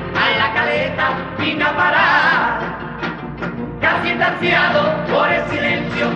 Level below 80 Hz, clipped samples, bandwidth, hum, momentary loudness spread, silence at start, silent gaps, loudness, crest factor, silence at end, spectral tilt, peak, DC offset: -42 dBFS; under 0.1%; 8.6 kHz; none; 12 LU; 0 s; none; -16 LUFS; 14 dB; 0 s; -6 dB/octave; -2 dBFS; under 0.1%